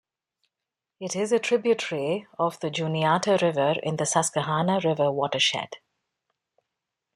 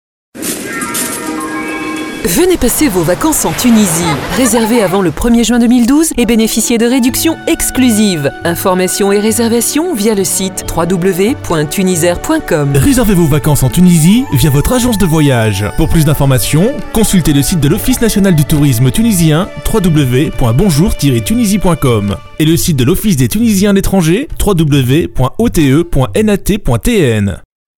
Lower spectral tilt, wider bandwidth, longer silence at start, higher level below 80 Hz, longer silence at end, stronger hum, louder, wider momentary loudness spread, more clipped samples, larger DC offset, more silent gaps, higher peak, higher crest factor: about the same, -4 dB/octave vs -5 dB/octave; second, 14 kHz vs over 20 kHz; first, 1 s vs 0.35 s; second, -70 dBFS vs -24 dBFS; first, 1.4 s vs 0.35 s; neither; second, -25 LUFS vs -10 LUFS; about the same, 7 LU vs 6 LU; neither; neither; neither; second, -6 dBFS vs 0 dBFS; first, 20 dB vs 10 dB